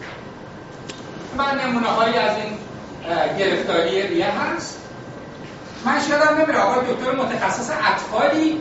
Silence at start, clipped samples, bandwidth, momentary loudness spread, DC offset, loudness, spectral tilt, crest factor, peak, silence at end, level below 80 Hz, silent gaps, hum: 0 s; under 0.1%; 8 kHz; 19 LU; under 0.1%; -20 LUFS; -2.5 dB/octave; 18 dB; -4 dBFS; 0 s; -54 dBFS; none; none